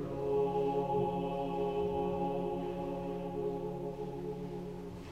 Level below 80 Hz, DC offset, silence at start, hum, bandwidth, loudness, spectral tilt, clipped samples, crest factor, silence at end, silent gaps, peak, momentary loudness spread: -54 dBFS; under 0.1%; 0 s; none; 13.5 kHz; -36 LUFS; -8.5 dB/octave; under 0.1%; 14 dB; 0 s; none; -22 dBFS; 9 LU